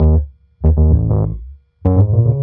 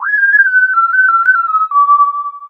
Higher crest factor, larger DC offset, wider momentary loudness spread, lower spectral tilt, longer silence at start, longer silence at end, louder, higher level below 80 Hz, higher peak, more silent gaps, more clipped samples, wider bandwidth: about the same, 12 dB vs 10 dB; neither; first, 11 LU vs 4 LU; first, -14.5 dB/octave vs 0 dB/octave; about the same, 0 s vs 0 s; about the same, 0 s vs 0 s; second, -15 LUFS vs -9 LUFS; first, -20 dBFS vs -78 dBFS; about the same, -2 dBFS vs 0 dBFS; neither; neither; second, 1.7 kHz vs 4.8 kHz